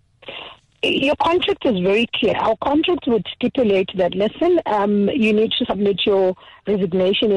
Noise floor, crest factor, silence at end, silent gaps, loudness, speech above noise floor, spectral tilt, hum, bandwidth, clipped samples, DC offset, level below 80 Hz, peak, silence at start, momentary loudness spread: -38 dBFS; 10 dB; 0 s; none; -18 LUFS; 20 dB; -6.5 dB/octave; none; 10 kHz; under 0.1%; under 0.1%; -50 dBFS; -10 dBFS; 0.25 s; 6 LU